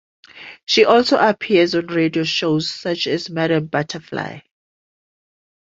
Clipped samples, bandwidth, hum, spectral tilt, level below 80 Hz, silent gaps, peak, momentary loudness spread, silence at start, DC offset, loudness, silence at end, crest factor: under 0.1%; 7.8 kHz; none; -5 dB/octave; -60 dBFS; 0.63-0.67 s; 0 dBFS; 14 LU; 0.35 s; under 0.1%; -18 LUFS; 1.2 s; 18 dB